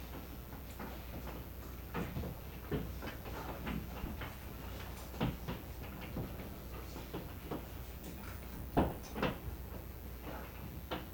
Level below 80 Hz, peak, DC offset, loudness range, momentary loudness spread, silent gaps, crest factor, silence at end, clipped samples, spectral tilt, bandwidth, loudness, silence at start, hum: -48 dBFS; -18 dBFS; under 0.1%; 3 LU; 9 LU; none; 24 dB; 0 s; under 0.1%; -6 dB/octave; over 20 kHz; -44 LUFS; 0 s; none